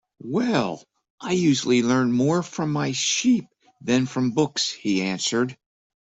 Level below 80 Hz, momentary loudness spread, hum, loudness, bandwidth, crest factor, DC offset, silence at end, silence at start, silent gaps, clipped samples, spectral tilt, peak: -64 dBFS; 8 LU; none; -23 LUFS; 8.4 kHz; 16 dB; under 0.1%; 0.6 s; 0.25 s; 1.10-1.18 s; under 0.1%; -4.5 dB/octave; -6 dBFS